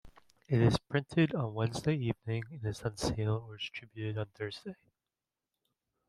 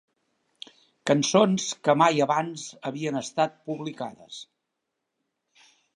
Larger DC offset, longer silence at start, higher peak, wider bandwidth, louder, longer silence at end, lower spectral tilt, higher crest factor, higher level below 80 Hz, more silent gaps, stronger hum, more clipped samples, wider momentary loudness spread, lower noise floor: neither; second, 0.05 s vs 1.05 s; second, -14 dBFS vs -6 dBFS; about the same, 12.5 kHz vs 11.5 kHz; second, -34 LUFS vs -25 LUFS; second, 1.35 s vs 1.5 s; first, -6.5 dB/octave vs -4.5 dB/octave; about the same, 20 dB vs 22 dB; first, -56 dBFS vs -78 dBFS; neither; neither; neither; second, 12 LU vs 21 LU; first, under -90 dBFS vs -82 dBFS